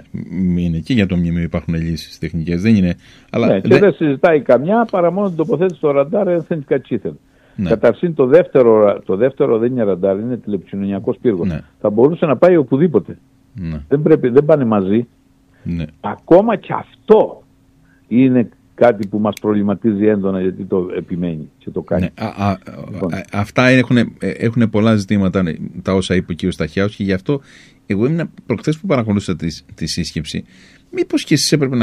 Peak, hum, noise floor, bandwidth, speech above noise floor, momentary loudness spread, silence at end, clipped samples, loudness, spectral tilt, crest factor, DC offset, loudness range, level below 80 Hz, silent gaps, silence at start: 0 dBFS; none; -51 dBFS; 13.5 kHz; 36 dB; 13 LU; 0 s; under 0.1%; -16 LUFS; -6.5 dB/octave; 16 dB; under 0.1%; 5 LU; -42 dBFS; none; 0.15 s